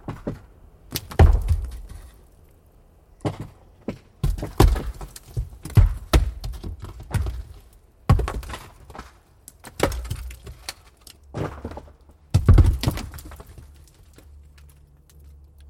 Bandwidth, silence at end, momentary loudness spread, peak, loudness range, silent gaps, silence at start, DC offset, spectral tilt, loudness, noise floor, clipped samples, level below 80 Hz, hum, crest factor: 17 kHz; 2.05 s; 24 LU; -2 dBFS; 8 LU; none; 0.05 s; under 0.1%; -6.5 dB/octave; -24 LUFS; -53 dBFS; under 0.1%; -28 dBFS; none; 22 dB